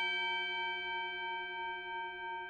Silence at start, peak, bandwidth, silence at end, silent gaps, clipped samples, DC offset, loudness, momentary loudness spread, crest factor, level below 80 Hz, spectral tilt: 0 s; -26 dBFS; 8.4 kHz; 0 s; none; under 0.1%; under 0.1%; -37 LUFS; 7 LU; 14 dB; -72 dBFS; -2.5 dB/octave